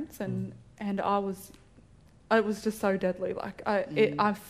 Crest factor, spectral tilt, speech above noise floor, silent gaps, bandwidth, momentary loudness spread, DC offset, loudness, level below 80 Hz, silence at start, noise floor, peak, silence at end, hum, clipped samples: 18 dB; -6 dB/octave; 28 dB; none; 15.5 kHz; 12 LU; under 0.1%; -30 LUFS; -62 dBFS; 0 s; -57 dBFS; -12 dBFS; 0 s; none; under 0.1%